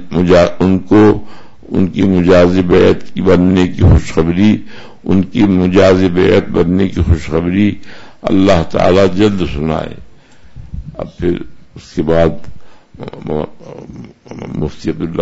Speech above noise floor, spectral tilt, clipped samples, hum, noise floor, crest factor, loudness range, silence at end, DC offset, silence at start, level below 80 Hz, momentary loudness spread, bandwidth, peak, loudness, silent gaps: 25 dB; -7.5 dB/octave; under 0.1%; none; -36 dBFS; 12 dB; 9 LU; 0 s; under 0.1%; 0 s; -28 dBFS; 19 LU; 8 kHz; 0 dBFS; -12 LUFS; none